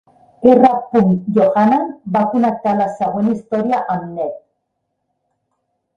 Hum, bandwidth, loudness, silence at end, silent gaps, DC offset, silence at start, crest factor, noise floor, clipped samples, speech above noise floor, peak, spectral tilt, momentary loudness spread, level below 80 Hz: none; 7.6 kHz; -16 LUFS; 1.6 s; none; under 0.1%; 0.4 s; 16 dB; -72 dBFS; under 0.1%; 58 dB; 0 dBFS; -9 dB/octave; 11 LU; -56 dBFS